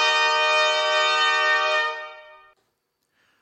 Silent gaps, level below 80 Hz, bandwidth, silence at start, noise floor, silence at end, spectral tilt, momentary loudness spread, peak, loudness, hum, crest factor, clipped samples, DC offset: none; -76 dBFS; 8.4 kHz; 0 s; -74 dBFS; 1.2 s; 2 dB/octave; 9 LU; -10 dBFS; -19 LUFS; none; 14 dB; under 0.1%; under 0.1%